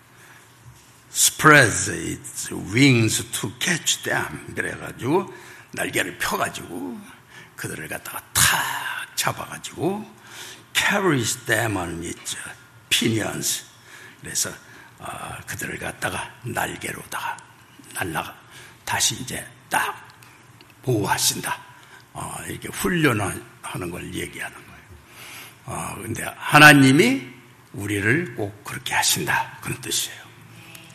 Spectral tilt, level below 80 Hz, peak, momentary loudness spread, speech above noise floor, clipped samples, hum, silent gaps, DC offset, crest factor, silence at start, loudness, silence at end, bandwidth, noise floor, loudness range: -3 dB/octave; -56 dBFS; 0 dBFS; 19 LU; 27 dB; under 0.1%; none; none; under 0.1%; 24 dB; 0.3 s; -21 LUFS; 0.05 s; 14 kHz; -49 dBFS; 12 LU